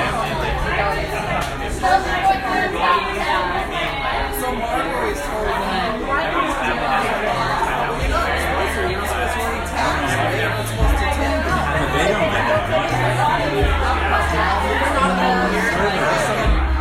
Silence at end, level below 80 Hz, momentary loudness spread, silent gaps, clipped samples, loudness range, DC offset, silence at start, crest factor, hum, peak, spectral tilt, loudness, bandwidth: 0 s; -28 dBFS; 4 LU; none; under 0.1%; 3 LU; under 0.1%; 0 s; 16 dB; none; -2 dBFS; -5 dB/octave; -19 LUFS; 16.5 kHz